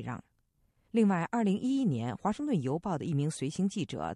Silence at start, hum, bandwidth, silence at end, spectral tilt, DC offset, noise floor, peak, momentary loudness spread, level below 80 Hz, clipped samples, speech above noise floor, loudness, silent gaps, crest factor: 0 s; none; 11.5 kHz; 0 s; -7 dB/octave; under 0.1%; -73 dBFS; -16 dBFS; 6 LU; -64 dBFS; under 0.1%; 42 dB; -31 LUFS; none; 16 dB